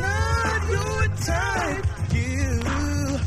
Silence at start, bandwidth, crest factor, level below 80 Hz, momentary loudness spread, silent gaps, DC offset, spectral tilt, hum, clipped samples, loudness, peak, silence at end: 0 s; 14.5 kHz; 14 dB; -30 dBFS; 3 LU; none; under 0.1%; -5 dB/octave; none; under 0.1%; -24 LUFS; -8 dBFS; 0 s